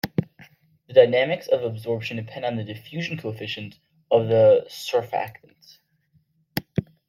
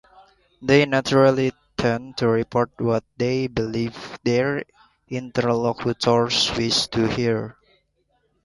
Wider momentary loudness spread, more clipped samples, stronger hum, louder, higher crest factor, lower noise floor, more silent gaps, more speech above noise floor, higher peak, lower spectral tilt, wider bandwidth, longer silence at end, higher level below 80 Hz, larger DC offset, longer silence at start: first, 16 LU vs 10 LU; neither; neither; about the same, -23 LUFS vs -21 LUFS; about the same, 22 dB vs 18 dB; about the same, -65 dBFS vs -68 dBFS; neither; second, 43 dB vs 47 dB; about the same, -2 dBFS vs -4 dBFS; about the same, -6 dB/octave vs -5 dB/octave; first, 16.5 kHz vs 11.5 kHz; second, 0.25 s vs 0.95 s; second, -62 dBFS vs -50 dBFS; neither; second, 0.05 s vs 0.6 s